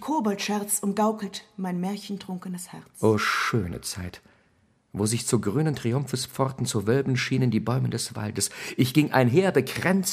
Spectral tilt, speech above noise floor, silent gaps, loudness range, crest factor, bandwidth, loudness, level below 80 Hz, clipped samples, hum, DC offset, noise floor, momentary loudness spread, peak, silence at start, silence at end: -5 dB/octave; 39 dB; none; 4 LU; 22 dB; 15.5 kHz; -26 LUFS; -58 dBFS; under 0.1%; none; under 0.1%; -65 dBFS; 13 LU; -4 dBFS; 0 s; 0 s